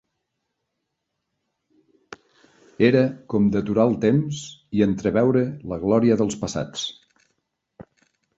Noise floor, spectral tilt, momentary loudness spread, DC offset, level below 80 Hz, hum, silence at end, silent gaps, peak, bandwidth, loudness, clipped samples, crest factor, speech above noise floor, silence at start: -79 dBFS; -6.5 dB/octave; 10 LU; under 0.1%; -52 dBFS; none; 0.55 s; none; -4 dBFS; 8 kHz; -21 LUFS; under 0.1%; 20 dB; 58 dB; 2.8 s